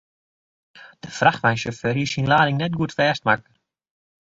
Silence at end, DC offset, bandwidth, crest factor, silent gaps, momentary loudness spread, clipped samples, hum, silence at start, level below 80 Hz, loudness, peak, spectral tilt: 0.95 s; under 0.1%; 7.8 kHz; 22 dB; none; 7 LU; under 0.1%; none; 0.75 s; -54 dBFS; -21 LUFS; -2 dBFS; -5.5 dB/octave